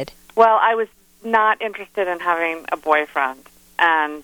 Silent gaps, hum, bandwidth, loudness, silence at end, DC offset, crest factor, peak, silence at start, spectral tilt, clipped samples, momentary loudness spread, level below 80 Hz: none; none; 19.5 kHz; -19 LUFS; 0 s; under 0.1%; 18 dB; -2 dBFS; 0 s; -4 dB/octave; under 0.1%; 11 LU; -60 dBFS